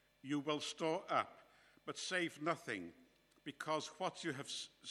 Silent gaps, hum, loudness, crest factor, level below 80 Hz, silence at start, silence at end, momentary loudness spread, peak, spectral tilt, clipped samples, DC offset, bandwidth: none; none; -42 LUFS; 22 dB; -86 dBFS; 0.25 s; 0 s; 11 LU; -22 dBFS; -3.5 dB/octave; under 0.1%; under 0.1%; 14.5 kHz